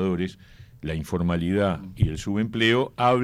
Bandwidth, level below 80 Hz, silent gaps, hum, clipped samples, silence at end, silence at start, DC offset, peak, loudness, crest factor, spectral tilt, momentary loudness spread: 15 kHz; -44 dBFS; none; none; under 0.1%; 0 s; 0 s; under 0.1%; -8 dBFS; -25 LUFS; 16 dB; -6.5 dB/octave; 11 LU